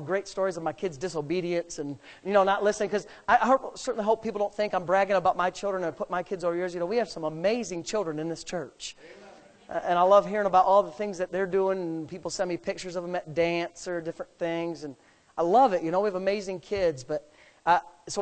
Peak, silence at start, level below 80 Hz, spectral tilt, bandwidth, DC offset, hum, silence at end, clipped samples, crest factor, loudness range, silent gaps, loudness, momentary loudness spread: -8 dBFS; 0 s; -60 dBFS; -5 dB/octave; 9 kHz; under 0.1%; none; 0 s; under 0.1%; 20 dB; 6 LU; none; -27 LUFS; 13 LU